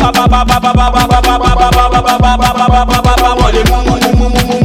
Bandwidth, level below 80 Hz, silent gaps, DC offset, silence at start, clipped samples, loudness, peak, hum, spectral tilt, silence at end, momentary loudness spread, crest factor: 16.5 kHz; -14 dBFS; none; under 0.1%; 0 s; under 0.1%; -9 LUFS; 0 dBFS; none; -5 dB/octave; 0 s; 2 LU; 8 dB